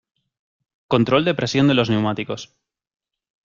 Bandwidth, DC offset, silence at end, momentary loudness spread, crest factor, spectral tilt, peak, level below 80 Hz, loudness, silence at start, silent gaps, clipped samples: 7.4 kHz; under 0.1%; 1.05 s; 11 LU; 20 dB; -6 dB/octave; -2 dBFS; -54 dBFS; -19 LUFS; 0.9 s; none; under 0.1%